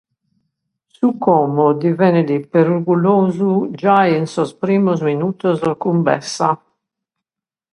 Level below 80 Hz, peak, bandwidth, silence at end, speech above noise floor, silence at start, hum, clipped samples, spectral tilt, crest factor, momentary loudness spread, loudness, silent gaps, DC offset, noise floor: -62 dBFS; 0 dBFS; 11 kHz; 1.15 s; 74 dB; 1 s; none; under 0.1%; -7.5 dB/octave; 16 dB; 5 LU; -16 LUFS; none; under 0.1%; -89 dBFS